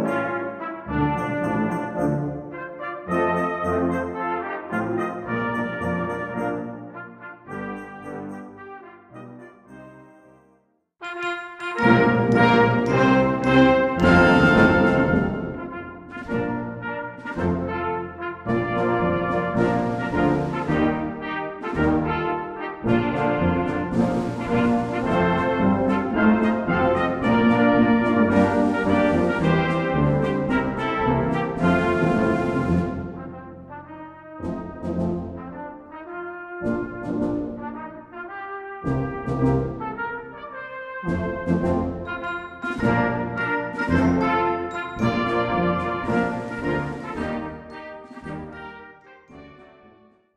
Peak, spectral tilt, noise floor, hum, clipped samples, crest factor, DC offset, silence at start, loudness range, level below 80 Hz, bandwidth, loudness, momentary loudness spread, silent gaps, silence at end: -2 dBFS; -8 dB/octave; -63 dBFS; none; under 0.1%; 20 dB; under 0.1%; 0 s; 13 LU; -44 dBFS; 10.5 kHz; -22 LUFS; 18 LU; none; 0.7 s